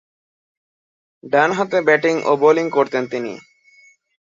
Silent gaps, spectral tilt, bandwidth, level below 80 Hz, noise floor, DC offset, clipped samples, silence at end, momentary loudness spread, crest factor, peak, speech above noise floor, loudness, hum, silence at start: none; -5.5 dB/octave; 7.6 kHz; -68 dBFS; -52 dBFS; under 0.1%; under 0.1%; 0.95 s; 11 LU; 18 dB; -2 dBFS; 35 dB; -17 LUFS; none; 1.25 s